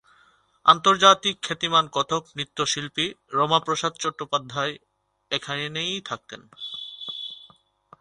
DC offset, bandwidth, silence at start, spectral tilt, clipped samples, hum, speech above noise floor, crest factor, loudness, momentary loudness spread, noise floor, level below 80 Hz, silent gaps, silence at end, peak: under 0.1%; 11 kHz; 0.65 s; -2.5 dB/octave; under 0.1%; none; 37 dB; 24 dB; -23 LUFS; 18 LU; -60 dBFS; -66 dBFS; none; 0.65 s; -2 dBFS